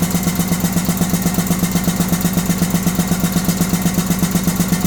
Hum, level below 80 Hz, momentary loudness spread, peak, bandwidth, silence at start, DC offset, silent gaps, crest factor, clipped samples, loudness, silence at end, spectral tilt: none; -34 dBFS; 1 LU; -2 dBFS; 19.5 kHz; 0 s; under 0.1%; none; 14 dB; under 0.1%; -17 LUFS; 0 s; -5 dB/octave